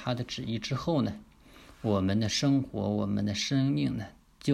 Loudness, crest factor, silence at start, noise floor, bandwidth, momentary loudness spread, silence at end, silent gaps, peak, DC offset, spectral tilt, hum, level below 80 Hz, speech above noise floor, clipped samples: -30 LUFS; 16 dB; 0 s; -54 dBFS; 13.5 kHz; 9 LU; 0 s; none; -14 dBFS; under 0.1%; -5.5 dB/octave; none; -56 dBFS; 25 dB; under 0.1%